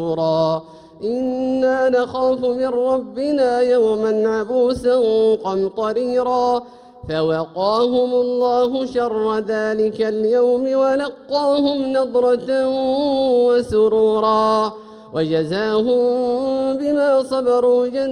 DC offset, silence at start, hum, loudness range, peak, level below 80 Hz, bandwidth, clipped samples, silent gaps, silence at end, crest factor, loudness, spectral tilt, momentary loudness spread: under 0.1%; 0 s; none; 2 LU; -6 dBFS; -52 dBFS; 10.5 kHz; under 0.1%; none; 0 s; 10 dB; -18 LUFS; -6 dB/octave; 5 LU